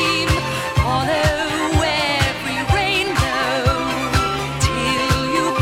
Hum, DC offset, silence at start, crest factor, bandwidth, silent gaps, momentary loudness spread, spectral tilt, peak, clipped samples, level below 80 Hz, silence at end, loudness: none; under 0.1%; 0 s; 16 dB; 17 kHz; none; 3 LU; -4.5 dB/octave; -2 dBFS; under 0.1%; -30 dBFS; 0 s; -18 LUFS